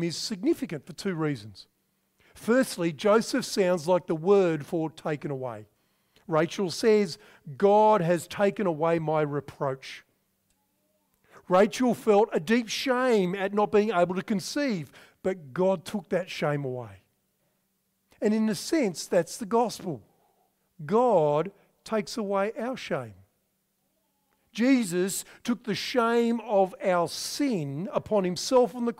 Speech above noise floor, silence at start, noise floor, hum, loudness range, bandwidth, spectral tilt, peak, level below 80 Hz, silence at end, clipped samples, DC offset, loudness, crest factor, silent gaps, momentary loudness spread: 48 dB; 0 s; -75 dBFS; none; 5 LU; 16 kHz; -5 dB/octave; -10 dBFS; -68 dBFS; 0.05 s; under 0.1%; under 0.1%; -26 LUFS; 16 dB; none; 12 LU